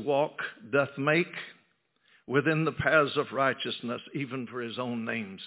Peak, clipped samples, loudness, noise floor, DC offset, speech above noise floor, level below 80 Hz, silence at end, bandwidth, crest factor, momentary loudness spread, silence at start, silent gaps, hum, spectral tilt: -10 dBFS; under 0.1%; -29 LUFS; -70 dBFS; under 0.1%; 41 dB; -64 dBFS; 0 s; 4 kHz; 20 dB; 11 LU; 0 s; none; none; -9.5 dB/octave